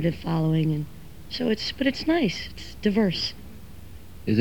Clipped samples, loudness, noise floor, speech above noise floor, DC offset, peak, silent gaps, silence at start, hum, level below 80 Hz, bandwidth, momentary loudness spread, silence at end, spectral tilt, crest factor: under 0.1%; -26 LUFS; -44 dBFS; 19 dB; 0.7%; -8 dBFS; none; 0 s; none; -46 dBFS; 19 kHz; 22 LU; 0 s; -6.5 dB/octave; 18 dB